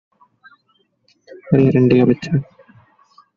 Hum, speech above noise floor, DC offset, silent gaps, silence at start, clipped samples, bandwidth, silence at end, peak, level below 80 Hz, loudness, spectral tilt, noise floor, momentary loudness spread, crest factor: none; 49 dB; under 0.1%; none; 1.45 s; under 0.1%; 7.2 kHz; 0.95 s; -2 dBFS; -52 dBFS; -15 LUFS; -8.5 dB/octave; -63 dBFS; 9 LU; 16 dB